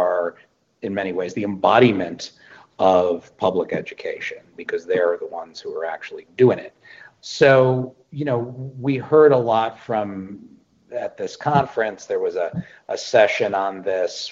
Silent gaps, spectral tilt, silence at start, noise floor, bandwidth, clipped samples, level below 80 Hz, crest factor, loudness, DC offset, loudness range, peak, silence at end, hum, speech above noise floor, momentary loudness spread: none; -6 dB/octave; 0 s; -55 dBFS; 7.8 kHz; under 0.1%; -62 dBFS; 20 dB; -20 LUFS; under 0.1%; 5 LU; -2 dBFS; 0 s; none; 34 dB; 18 LU